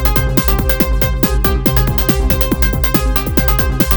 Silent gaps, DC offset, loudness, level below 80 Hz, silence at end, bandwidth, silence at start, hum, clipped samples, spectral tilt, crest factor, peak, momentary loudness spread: none; 0.5%; -13 LUFS; -16 dBFS; 0 s; over 20 kHz; 0 s; none; under 0.1%; -5.5 dB/octave; 14 dB; 0 dBFS; 1 LU